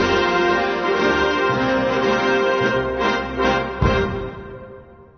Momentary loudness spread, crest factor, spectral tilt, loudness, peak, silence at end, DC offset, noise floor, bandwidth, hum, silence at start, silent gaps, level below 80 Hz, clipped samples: 9 LU; 14 dB; -5.5 dB/octave; -19 LUFS; -6 dBFS; 0.15 s; under 0.1%; -41 dBFS; 6.6 kHz; none; 0 s; none; -36 dBFS; under 0.1%